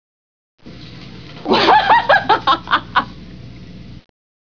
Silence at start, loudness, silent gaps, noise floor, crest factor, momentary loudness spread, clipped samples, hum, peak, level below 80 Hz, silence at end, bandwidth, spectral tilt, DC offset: 0.65 s; -14 LUFS; none; -36 dBFS; 18 dB; 25 LU; under 0.1%; 60 Hz at -40 dBFS; 0 dBFS; -46 dBFS; 0.5 s; 5.4 kHz; -5 dB/octave; 0.8%